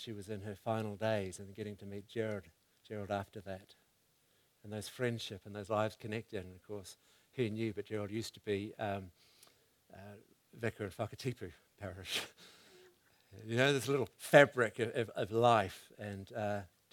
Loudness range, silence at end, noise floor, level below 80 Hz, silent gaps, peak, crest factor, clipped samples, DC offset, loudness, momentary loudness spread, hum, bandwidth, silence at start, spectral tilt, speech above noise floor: 12 LU; 0.25 s; -74 dBFS; -74 dBFS; none; -8 dBFS; 30 dB; under 0.1%; under 0.1%; -37 LUFS; 19 LU; none; 18.5 kHz; 0 s; -5 dB/octave; 37 dB